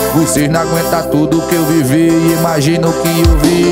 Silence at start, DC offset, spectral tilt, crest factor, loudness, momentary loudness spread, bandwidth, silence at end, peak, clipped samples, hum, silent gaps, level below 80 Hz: 0 s; under 0.1%; -5.5 dB/octave; 10 dB; -11 LUFS; 3 LU; 16.5 kHz; 0 s; 0 dBFS; under 0.1%; none; none; -22 dBFS